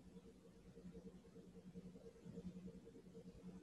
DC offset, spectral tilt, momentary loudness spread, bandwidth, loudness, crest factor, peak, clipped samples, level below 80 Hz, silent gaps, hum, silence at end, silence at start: under 0.1%; -7.5 dB/octave; 8 LU; 11.5 kHz; -60 LUFS; 16 dB; -42 dBFS; under 0.1%; -72 dBFS; none; none; 0 s; 0 s